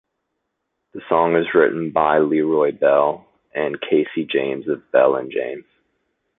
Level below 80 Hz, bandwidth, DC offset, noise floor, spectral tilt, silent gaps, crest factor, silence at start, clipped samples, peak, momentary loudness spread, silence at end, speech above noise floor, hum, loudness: -62 dBFS; 4 kHz; under 0.1%; -76 dBFS; -10.5 dB/octave; none; 18 dB; 0.95 s; under 0.1%; -2 dBFS; 14 LU; 0.8 s; 58 dB; none; -19 LUFS